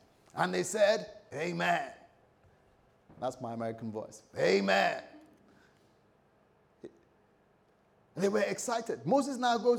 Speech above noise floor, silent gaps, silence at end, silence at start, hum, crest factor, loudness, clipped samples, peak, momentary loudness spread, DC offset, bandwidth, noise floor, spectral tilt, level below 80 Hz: 37 dB; none; 0 s; 0.35 s; none; 20 dB; -32 LUFS; under 0.1%; -14 dBFS; 17 LU; under 0.1%; 18.5 kHz; -68 dBFS; -4.5 dB/octave; -78 dBFS